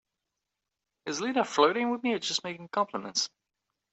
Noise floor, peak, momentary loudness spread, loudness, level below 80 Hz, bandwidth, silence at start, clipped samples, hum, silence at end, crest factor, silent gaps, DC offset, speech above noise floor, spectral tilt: -87 dBFS; -8 dBFS; 10 LU; -29 LUFS; -78 dBFS; 8.4 kHz; 1.05 s; under 0.1%; none; 0.65 s; 22 dB; none; under 0.1%; 58 dB; -2.5 dB/octave